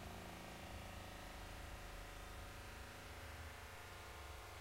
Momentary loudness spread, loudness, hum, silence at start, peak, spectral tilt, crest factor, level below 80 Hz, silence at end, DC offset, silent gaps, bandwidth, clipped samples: 1 LU; -54 LUFS; none; 0 s; -40 dBFS; -4 dB/octave; 12 dB; -58 dBFS; 0 s; under 0.1%; none; 16 kHz; under 0.1%